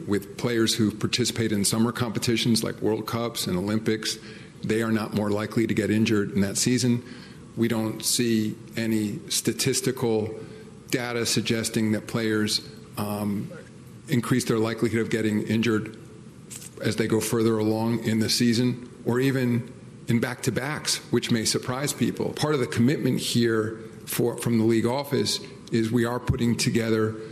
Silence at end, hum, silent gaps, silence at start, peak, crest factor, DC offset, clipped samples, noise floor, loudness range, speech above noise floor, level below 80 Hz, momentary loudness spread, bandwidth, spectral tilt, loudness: 0 s; none; none; 0 s; -8 dBFS; 16 dB; under 0.1%; under 0.1%; -44 dBFS; 2 LU; 20 dB; -56 dBFS; 9 LU; 14.5 kHz; -4.5 dB/octave; -25 LUFS